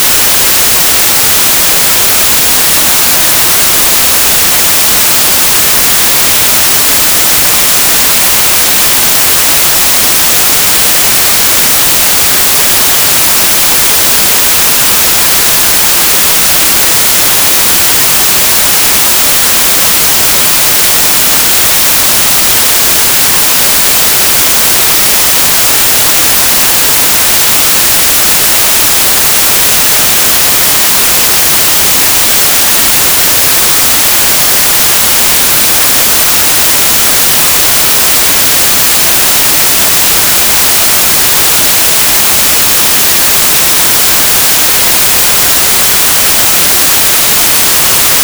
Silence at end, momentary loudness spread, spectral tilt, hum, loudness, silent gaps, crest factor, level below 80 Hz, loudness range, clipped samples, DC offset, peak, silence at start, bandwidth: 0 s; 0 LU; 0 dB/octave; none; -3 LUFS; none; 6 dB; -32 dBFS; 0 LU; 2%; under 0.1%; 0 dBFS; 0 s; over 20 kHz